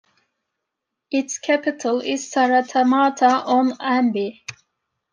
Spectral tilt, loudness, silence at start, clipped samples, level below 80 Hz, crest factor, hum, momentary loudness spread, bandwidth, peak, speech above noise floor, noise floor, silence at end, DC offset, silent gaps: -3.5 dB/octave; -20 LUFS; 1.1 s; under 0.1%; -74 dBFS; 18 dB; none; 9 LU; 10 kHz; -4 dBFS; 62 dB; -81 dBFS; 0.6 s; under 0.1%; none